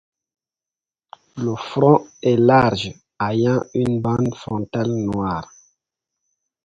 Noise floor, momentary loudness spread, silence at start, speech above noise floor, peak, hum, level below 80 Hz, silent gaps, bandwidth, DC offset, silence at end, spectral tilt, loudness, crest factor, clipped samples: under -90 dBFS; 12 LU; 1.35 s; over 71 dB; 0 dBFS; none; -50 dBFS; none; 8.8 kHz; under 0.1%; 1.2 s; -7.5 dB/octave; -19 LUFS; 20 dB; under 0.1%